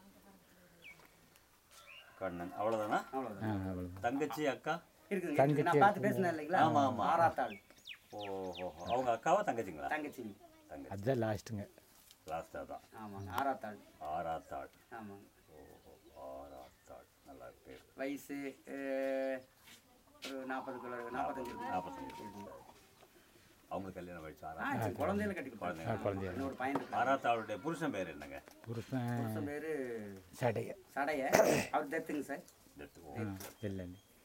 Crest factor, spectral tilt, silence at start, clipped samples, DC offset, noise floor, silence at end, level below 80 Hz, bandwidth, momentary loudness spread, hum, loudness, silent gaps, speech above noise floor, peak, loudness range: 30 dB; -5.5 dB/octave; 0.05 s; under 0.1%; under 0.1%; -66 dBFS; 0.25 s; -70 dBFS; 16 kHz; 22 LU; none; -38 LUFS; none; 29 dB; -8 dBFS; 13 LU